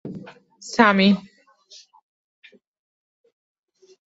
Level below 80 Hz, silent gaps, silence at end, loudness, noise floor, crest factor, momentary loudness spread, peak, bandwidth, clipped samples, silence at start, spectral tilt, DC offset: -66 dBFS; none; 2.85 s; -18 LUFS; -51 dBFS; 24 dB; 25 LU; -2 dBFS; 8 kHz; under 0.1%; 0.05 s; -5.5 dB/octave; under 0.1%